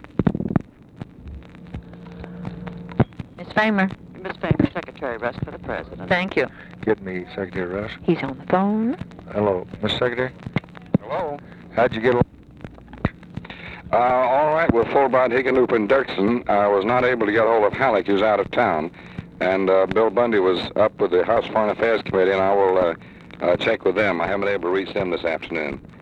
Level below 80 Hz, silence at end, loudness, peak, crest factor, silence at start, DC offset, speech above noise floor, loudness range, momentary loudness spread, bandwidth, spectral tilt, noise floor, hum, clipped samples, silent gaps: -46 dBFS; 0.05 s; -21 LUFS; -2 dBFS; 20 dB; 0.05 s; under 0.1%; 20 dB; 7 LU; 18 LU; 8.6 kHz; -8 dB/octave; -41 dBFS; none; under 0.1%; none